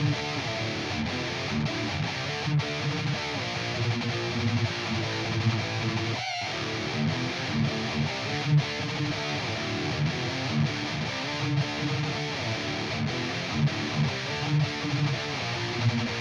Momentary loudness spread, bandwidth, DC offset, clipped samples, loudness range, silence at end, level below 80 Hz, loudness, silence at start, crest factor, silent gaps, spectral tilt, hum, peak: 3 LU; 10 kHz; under 0.1%; under 0.1%; 1 LU; 0 s; -54 dBFS; -28 LUFS; 0 s; 14 dB; none; -5 dB/octave; none; -14 dBFS